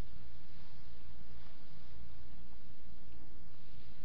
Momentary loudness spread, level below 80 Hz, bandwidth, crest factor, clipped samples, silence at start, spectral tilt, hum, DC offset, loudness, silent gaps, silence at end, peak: 2 LU; -58 dBFS; 5.4 kHz; 10 dB; under 0.1%; 0 s; -7 dB/octave; none; 4%; -59 LUFS; none; 0 s; -26 dBFS